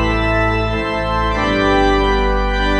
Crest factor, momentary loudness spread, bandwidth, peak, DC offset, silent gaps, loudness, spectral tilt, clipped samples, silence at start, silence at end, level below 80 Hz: 12 dB; 5 LU; 8.4 kHz; -2 dBFS; under 0.1%; none; -16 LUFS; -6 dB/octave; under 0.1%; 0 s; 0 s; -22 dBFS